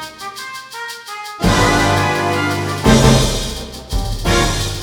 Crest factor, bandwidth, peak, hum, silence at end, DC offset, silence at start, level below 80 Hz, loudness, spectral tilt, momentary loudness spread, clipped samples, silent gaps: 16 dB; over 20 kHz; 0 dBFS; none; 0 s; under 0.1%; 0 s; -24 dBFS; -15 LUFS; -4.5 dB/octave; 16 LU; under 0.1%; none